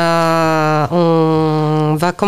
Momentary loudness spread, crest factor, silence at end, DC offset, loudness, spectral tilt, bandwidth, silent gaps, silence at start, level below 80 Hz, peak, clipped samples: 2 LU; 12 dB; 0 s; under 0.1%; -14 LUFS; -6.5 dB/octave; 14 kHz; none; 0 s; -54 dBFS; -2 dBFS; under 0.1%